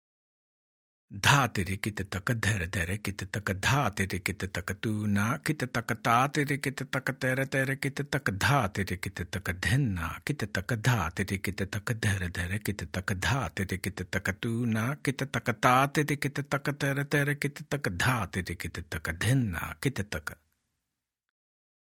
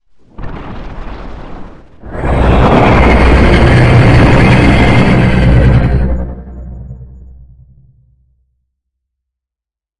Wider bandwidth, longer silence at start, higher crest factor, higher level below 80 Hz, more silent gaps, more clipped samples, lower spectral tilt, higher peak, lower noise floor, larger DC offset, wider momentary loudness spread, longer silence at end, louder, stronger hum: first, 17.5 kHz vs 10.5 kHz; first, 1.1 s vs 0.4 s; first, 24 dB vs 10 dB; second, -54 dBFS vs -16 dBFS; neither; second, under 0.1% vs 0.5%; second, -5 dB/octave vs -7.5 dB/octave; second, -8 dBFS vs 0 dBFS; about the same, -87 dBFS vs -86 dBFS; neither; second, 9 LU vs 22 LU; second, 1.6 s vs 2.95 s; second, -30 LUFS vs -8 LUFS; neither